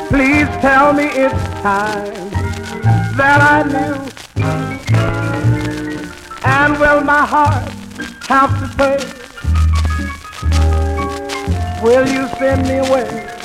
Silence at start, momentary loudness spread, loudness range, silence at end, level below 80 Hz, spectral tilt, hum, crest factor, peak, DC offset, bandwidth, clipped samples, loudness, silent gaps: 0 s; 12 LU; 3 LU; 0 s; -28 dBFS; -6.5 dB/octave; none; 14 dB; 0 dBFS; under 0.1%; 14.5 kHz; under 0.1%; -14 LUFS; none